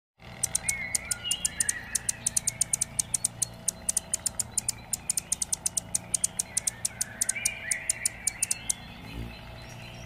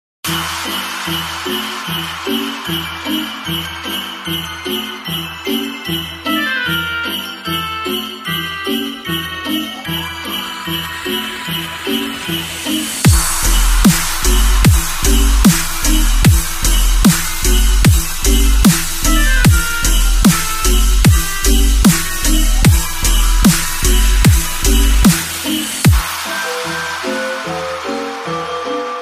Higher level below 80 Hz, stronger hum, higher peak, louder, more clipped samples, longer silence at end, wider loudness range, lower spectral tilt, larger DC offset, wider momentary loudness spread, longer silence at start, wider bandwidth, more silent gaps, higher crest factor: second, -52 dBFS vs -16 dBFS; neither; second, -6 dBFS vs 0 dBFS; second, -28 LUFS vs -15 LUFS; neither; about the same, 0 s vs 0 s; second, 2 LU vs 7 LU; second, -0.5 dB/octave vs -3.5 dB/octave; neither; about the same, 9 LU vs 9 LU; about the same, 0.2 s vs 0.25 s; about the same, 16 kHz vs 15.5 kHz; neither; first, 26 dB vs 14 dB